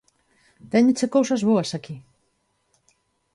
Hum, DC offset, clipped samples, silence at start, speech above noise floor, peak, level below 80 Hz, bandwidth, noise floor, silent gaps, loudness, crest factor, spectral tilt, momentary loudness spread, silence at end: none; under 0.1%; under 0.1%; 0.65 s; 49 dB; -8 dBFS; -66 dBFS; 11.5 kHz; -70 dBFS; none; -21 LUFS; 16 dB; -5.5 dB/octave; 18 LU; 1.35 s